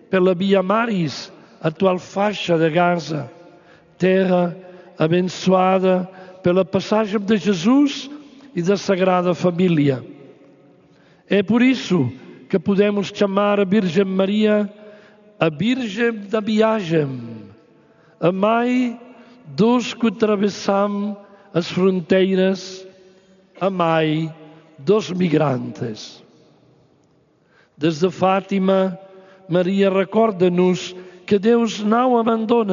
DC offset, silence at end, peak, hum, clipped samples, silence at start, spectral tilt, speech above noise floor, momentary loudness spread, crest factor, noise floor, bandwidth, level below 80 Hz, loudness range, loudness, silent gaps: under 0.1%; 0 s; -2 dBFS; none; under 0.1%; 0.1 s; -5.5 dB/octave; 40 dB; 12 LU; 16 dB; -58 dBFS; 7.4 kHz; -66 dBFS; 3 LU; -19 LUFS; none